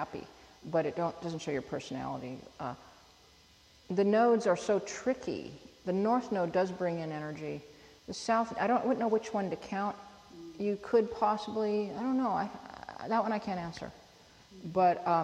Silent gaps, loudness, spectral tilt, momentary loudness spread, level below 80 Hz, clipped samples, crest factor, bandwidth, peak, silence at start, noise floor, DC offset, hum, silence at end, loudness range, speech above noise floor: none; -32 LUFS; -6 dB/octave; 17 LU; -66 dBFS; under 0.1%; 16 dB; 11.5 kHz; -16 dBFS; 0 s; -61 dBFS; under 0.1%; none; 0 s; 5 LU; 29 dB